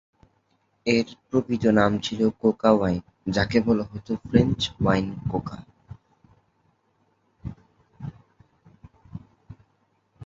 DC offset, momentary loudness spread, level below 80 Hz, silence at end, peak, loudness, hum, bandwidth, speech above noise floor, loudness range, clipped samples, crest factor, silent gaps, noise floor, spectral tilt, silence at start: under 0.1%; 20 LU; -48 dBFS; 0 s; -2 dBFS; -24 LUFS; none; 7.6 kHz; 46 dB; 22 LU; under 0.1%; 24 dB; none; -68 dBFS; -6.5 dB/octave; 0.85 s